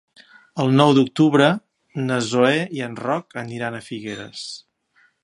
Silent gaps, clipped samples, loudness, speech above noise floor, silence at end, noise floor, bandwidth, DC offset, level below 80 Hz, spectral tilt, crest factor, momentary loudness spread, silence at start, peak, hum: none; under 0.1%; -20 LUFS; 41 dB; 0.65 s; -61 dBFS; 11.5 kHz; under 0.1%; -66 dBFS; -6 dB/octave; 20 dB; 17 LU; 0.55 s; 0 dBFS; none